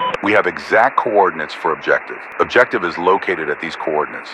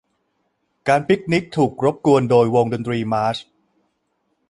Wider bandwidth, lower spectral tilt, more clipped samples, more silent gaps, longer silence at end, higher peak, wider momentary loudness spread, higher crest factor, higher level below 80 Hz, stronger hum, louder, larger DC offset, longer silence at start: about the same, 11 kHz vs 11.5 kHz; second, -5 dB/octave vs -7 dB/octave; neither; neither; second, 0 s vs 1.1 s; about the same, 0 dBFS vs -2 dBFS; about the same, 7 LU vs 8 LU; about the same, 16 dB vs 18 dB; about the same, -56 dBFS vs -56 dBFS; neither; about the same, -16 LUFS vs -18 LUFS; neither; second, 0 s vs 0.85 s